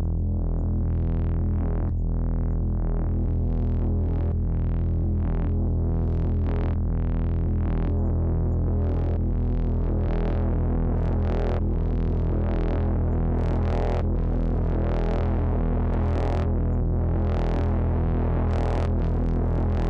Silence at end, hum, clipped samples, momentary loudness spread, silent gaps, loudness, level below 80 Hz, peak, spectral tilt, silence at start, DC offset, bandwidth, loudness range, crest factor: 0 s; none; under 0.1%; 2 LU; none; -26 LUFS; -26 dBFS; -20 dBFS; -10.5 dB/octave; 0 s; under 0.1%; 4.5 kHz; 1 LU; 4 dB